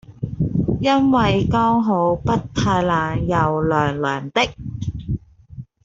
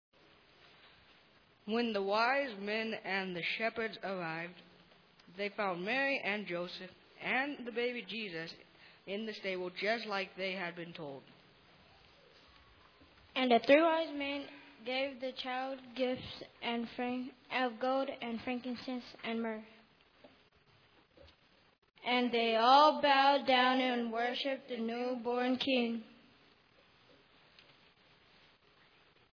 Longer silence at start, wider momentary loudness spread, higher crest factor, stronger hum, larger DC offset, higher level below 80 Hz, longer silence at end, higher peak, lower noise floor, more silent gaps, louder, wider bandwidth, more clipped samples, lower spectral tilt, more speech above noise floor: second, 0.1 s vs 1.65 s; second, 12 LU vs 16 LU; second, 16 dB vs 24 dB; neither; neither; first, -38 dBFS vs -78 dBFS; second, 0.2 s vs 3.2 s; first, -4 dBFS vs -12 dBFS; second, -39 dBFS vs -67 dBFS; second, none vs 21.78-21.82 s; first, -19 LUFS vs -34 LUFS; first, 7.8 kHz vs 5.4 kHz; neither; first, -6.5 dB/octave vs -5 dB/octave; second, 21 dB vs 33 dB